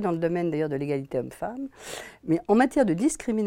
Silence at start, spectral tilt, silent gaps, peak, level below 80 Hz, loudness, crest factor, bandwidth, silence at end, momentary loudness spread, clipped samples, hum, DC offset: 0 s; -6 dB/octave; none; -8 dBFS; -56 dBFS; -26 LUFS; 16 dB; 16.5 kHz; 0 s; 15 LU; under 0.1%; none; under 0.1%